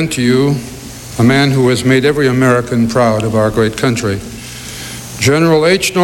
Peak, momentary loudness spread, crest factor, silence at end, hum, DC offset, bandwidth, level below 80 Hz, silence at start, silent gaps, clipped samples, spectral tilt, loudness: -2 dBFS; 15 LU; 10 dB; 0 s; none; under 0.1%; 16 kHz; -38 dBFS; 0 s; none; under 0.1%; -5.5 dB/octave; -12 LUFS